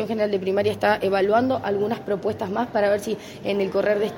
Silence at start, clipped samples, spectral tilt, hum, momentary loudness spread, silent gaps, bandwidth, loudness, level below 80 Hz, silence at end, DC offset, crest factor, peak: 0 s; under 0.1%; -6 dB/octave; none; 6 LU; none; 16.5 kHz; -23 LUFS; -58 dBFS; 0 s; under 0.1%; 16 dB; -6 dBFS